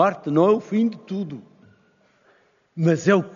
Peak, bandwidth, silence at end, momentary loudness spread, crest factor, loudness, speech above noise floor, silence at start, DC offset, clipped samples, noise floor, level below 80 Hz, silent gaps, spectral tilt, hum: -4 dBFS; 7.2 kHz; 0 s; 16 LU; 18 dB; -21 LUFS; 40 dB; 0 s; under 0.1%; under 0.1%; -61 dBFS; -72 dBFS; none; -7 dB/octave; none